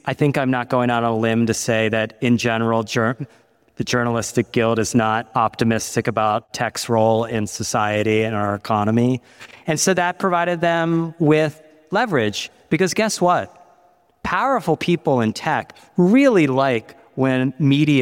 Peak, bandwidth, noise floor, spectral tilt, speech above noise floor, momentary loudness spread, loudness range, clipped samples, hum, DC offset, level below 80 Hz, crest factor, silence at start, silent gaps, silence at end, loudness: -4 dBFS; 17 kHz; -56 dBFS; -5 dB/octave; 38 dB; 7 LU; 2 LU; under 0.1%; none; under 0.1%; -54 dBFS; 14 dB; 0.05 s; none; 0 s; -19 LUFS